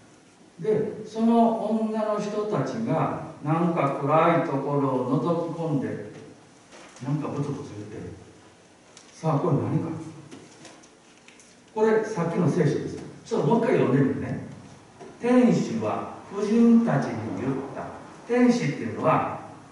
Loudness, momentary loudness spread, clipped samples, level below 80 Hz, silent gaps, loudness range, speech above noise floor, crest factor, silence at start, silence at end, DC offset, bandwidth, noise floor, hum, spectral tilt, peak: -25 LUFS; 17 LU; under 0.1%; -66 dBFS; none; 7 LU; 30 dB; 18 dB; 0.6 s; 0 s; under 0.1%; 11 kHz; -53 dBFS; none; -7.5 dB/octave; -8 dBFS